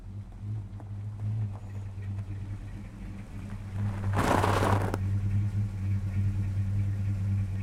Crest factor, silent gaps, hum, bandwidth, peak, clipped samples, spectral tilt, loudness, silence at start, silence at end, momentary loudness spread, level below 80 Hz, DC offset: 20 dB; none; none; 13.5 kHz; -10 dBFS; under 0.1%; -7 dB/octave; -31 LUFS; 0 s; 0 s; 15 LU; -44 dBFS; under 0.1%